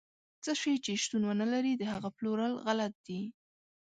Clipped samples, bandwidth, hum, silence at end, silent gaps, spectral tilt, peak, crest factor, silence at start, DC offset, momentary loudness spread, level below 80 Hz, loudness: under 0.1%; 9.4 kHz; none; 0.65 s; 2.95-3.04 s; -4 dB/octave; -20 dBFS; 16 dB; 0.45 s; under 0.1%; 10 LU; -74 dBFS; -34 LUFS